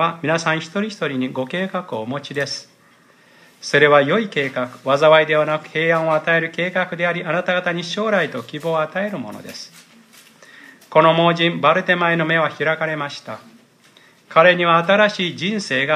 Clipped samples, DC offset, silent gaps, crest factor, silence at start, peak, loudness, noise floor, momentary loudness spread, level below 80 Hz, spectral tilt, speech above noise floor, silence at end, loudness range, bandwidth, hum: under 0.1%; under 0.1%; none; 18 dB; 0 s; 0 dBFS; -18 LUFS; -52 dBFS; 13 LU; -70 dBFS; -5 dB/octave; 34 dB; 0 s; 7 LU; 14 kHz; none